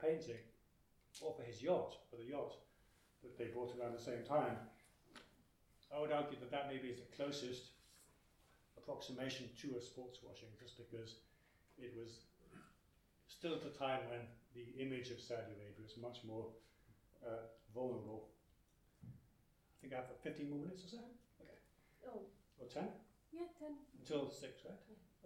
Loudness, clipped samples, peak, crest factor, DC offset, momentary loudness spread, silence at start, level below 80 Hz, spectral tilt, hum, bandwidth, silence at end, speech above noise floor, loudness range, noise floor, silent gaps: -48 LUFS; under 0.1%; -26 dBFS; 24 dB; under 0.1%; 21 LU; 0 s; -78 dBFS; -5.5 dB/octave; none; 17 kHz; 0 s; 27 dB; 8 LU; -75 dBFS; none